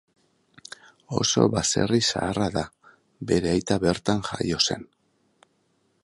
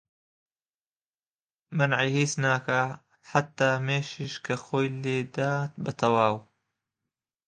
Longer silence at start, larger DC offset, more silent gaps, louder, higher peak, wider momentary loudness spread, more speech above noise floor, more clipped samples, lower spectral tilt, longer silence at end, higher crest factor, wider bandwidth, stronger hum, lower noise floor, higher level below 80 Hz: second, 1.1 s vs 1.7 s; neither; neither; first, -24 LUFS vs -27 LUFS; first, -2 dBFS vs -6 dBFS; first, 18 LU vs 9 LU; second, 45 dB vs over 63 dB; neither; about the same, -4 dB/octave vs -5 dB/octave; first, 1.2 s vs 1.05 s; about the same, 24 dB vs 24 dB; first, 11.5 kHz vs 9.8 kHz; neither; second, -69 dBFS vs under -90 dBFS; first, -48 dBFS vs -70 dBFS